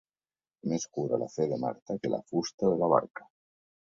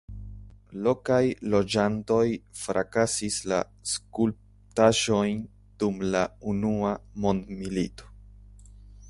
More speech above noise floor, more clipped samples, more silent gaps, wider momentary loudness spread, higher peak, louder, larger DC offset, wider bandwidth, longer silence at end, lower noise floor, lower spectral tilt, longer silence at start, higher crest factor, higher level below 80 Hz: first, over 60 dB vs 23 dB; neither; first, 1.82-1.86 s, 2.54-2.58 s, 3.10-3.14 s vs none; about the same, 10 LU vs 10 LU; about the same, -10 dBFS vs -8 dBFS; second, -31 LUFS vs -27 LUFS; neither; second, 7.6 kHz vs 11.5 kHz; first, 0.65 s vs 0 s; first, under -90 dBFS vs -49 dBFS; first, -6 dB/octave vs -4.5 dB/octave; first, 0.65 s vs 0.1 s; about the same, 22 dB vs 20 dB; second, -70 dBFS vs -50 dBFS